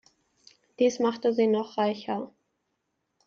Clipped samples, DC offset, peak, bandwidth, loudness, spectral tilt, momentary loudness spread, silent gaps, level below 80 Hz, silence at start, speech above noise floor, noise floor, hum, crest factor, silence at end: under 0.1%; under 0.1%; -12 dBFS; 7.4 kHz; -27 LUFS; -5.5 dB/octave; 10 LU; none; -76 dBFS; 0.8 s; 53 dB; -79 dBFS; none; 16 dB; 0.95 s